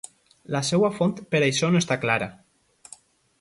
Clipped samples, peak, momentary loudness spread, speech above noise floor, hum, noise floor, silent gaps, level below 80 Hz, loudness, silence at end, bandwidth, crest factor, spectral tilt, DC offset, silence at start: under 0.1%; -6 dBFS; 9 LU; 28 dB; none; -51 dBFS; none; -62 dBFS; -23 LUFS; 1.05 s; 11.5 kHz; 18 dB; -5 dB/octave; under 0.1%; 0.5 s